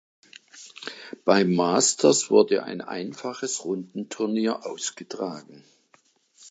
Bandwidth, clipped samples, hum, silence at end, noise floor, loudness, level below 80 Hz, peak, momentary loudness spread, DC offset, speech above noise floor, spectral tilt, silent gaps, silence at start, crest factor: 9.4 kHz; under 0.1%; none; 0 s; -63 dBFS; -24 LUFS; -76 dBFS; -4 dBFS; 19 LU; under 0.1%; 38 dB; -3.5 dB/octave; none; 0.55 s; 22 dB